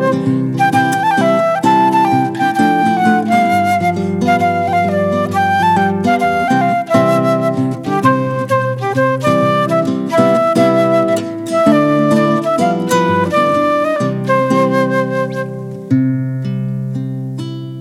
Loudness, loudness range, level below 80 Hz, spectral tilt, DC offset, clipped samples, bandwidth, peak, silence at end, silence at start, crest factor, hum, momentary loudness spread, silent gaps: -14 LUFS; 2 LU; -56 dBFS; -6.5 dB/octave; under 0.1%; under 0.1%; 16 kHz; 0 dBFS; 0 s; 0 s; 14 dB; none; 7 LU; none